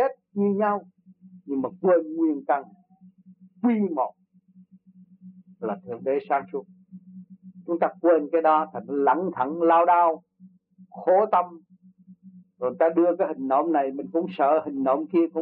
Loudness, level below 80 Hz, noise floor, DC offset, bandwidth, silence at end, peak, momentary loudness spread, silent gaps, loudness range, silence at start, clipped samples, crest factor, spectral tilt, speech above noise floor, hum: -24 LUFS; -80 dBFS; -56 dBFS; under 0.1%; 4.3 kHz; 0 s; -8 dBFS; 11 LU; none; 9 LU; 0 s; under 0.1%; 16 dB; -6.5 dB/octave; 33 dB; none